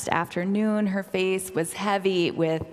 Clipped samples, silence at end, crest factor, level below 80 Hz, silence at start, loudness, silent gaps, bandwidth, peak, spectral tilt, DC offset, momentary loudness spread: under 0.1%; 0 s; 20 dB; -60 dBFS; 0 s; -25 LUFS; none; 15.5 kHz; -4 dBFS; -5 dB/octave; under 0.1%; 3 LU